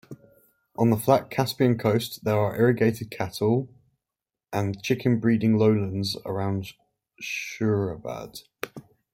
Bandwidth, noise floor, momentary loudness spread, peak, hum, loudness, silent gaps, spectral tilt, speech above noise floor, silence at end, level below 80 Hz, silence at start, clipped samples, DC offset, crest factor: 16.5 kHz; -89 dBFS; 16 LU; -6 dBFS; none; -25 LUFS; none; -6.5 dB/octave; 64 dB; 0.35 s; -60 dBFS; 0.1 s; under 0.1%; under 0.1%; 20 dB